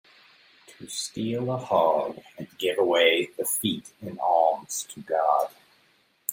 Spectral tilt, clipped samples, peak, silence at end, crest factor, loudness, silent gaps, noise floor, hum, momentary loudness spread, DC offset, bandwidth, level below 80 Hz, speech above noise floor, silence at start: -3 dB/octave; under 0.1%; -6 dBFS; 0 s; 20 dB; -25 LUFS; none; -64 dBFS; none; 14 LU; under 0.1%; 16.5 kHz; -72 dBFS; 39 dB; 0.7 s